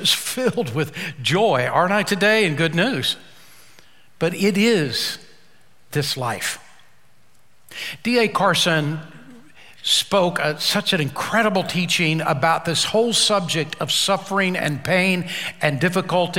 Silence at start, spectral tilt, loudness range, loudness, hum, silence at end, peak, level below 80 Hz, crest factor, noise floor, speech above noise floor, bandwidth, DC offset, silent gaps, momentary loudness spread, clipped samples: 0 s; -3.5 dB/octave; 4 LU; -20 LUFS; none; 0 s; -2 dBFS; -60 dBFS; 20 dB; -59 dBFS; 39 dB; 16.5 kHz; 0.5%; none; 9 LU; under 0.1%